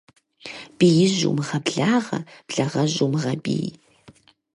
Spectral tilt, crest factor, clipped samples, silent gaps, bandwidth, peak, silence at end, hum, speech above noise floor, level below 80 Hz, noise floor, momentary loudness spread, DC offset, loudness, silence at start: -5.5 dB/octave; 18 dB; under 0.1%; none; 11.5 kHz; -6 dBFS; 0.85 s; none; 31 dB; -64 dBFS; -52 dBFS; 17 LU; under 0.1%; -22 LUFS; 0.45 s